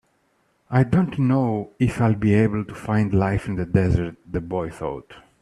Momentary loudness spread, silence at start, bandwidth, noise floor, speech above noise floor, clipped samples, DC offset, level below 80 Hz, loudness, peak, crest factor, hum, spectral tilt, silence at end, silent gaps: 10 LU; 0.7 s; 11.5 kHz; -66 dBFS; 45 dB; under 0.1%; under 0.1%; -42 dBFS; -22 LUFS; -4 dBFS; 18 dB; none; -9 dB/octave; 0.2 s; none